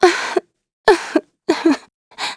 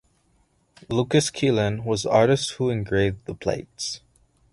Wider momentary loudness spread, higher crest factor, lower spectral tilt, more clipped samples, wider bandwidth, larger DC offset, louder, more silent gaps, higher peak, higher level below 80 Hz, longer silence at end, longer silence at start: about the same, 9 LU vs 11 LU; about the same, 18 dB vs 18 dB; second, -2.5 dB/octave vs -5 dB/octave; neither; about the same, 11 kHz vs 11.5 kHz; neither; first, -18 LUFS vs -23 LUFS; first, 0.73-0.84 s, 1.94-2.11 s vs none; first, 0 dBFS vs -6 dBFS; about the same, -52 dBFS vs -48 dBFS; second, 0 s vs 0.55 s; second, 0 s vs 0.9 s